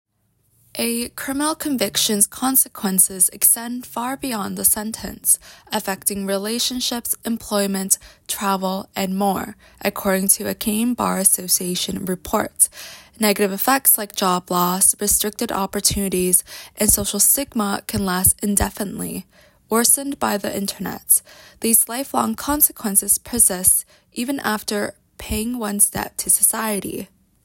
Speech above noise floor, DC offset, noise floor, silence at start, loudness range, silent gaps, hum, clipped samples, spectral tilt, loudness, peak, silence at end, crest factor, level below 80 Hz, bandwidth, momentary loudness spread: 44 dB; under 0.1%; -65 dBFS; 0.75 s; 4 LU; none; none; under 0.1%; -2.5 dB/octave; -18 LUFS; 0 dBFS; 0.4 s; 20 dB; -44 dBFS; 17 kHz; 12 LU